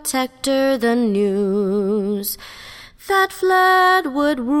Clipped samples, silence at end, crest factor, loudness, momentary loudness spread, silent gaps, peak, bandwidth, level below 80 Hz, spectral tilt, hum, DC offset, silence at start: under 0.1%; 0 s; 14 dB; -18 LUFS; 16 LU; none; -4 dBFS; 17 kHz; -52 dBFS; -4 dB/octave; none; under 0.1%; 0 s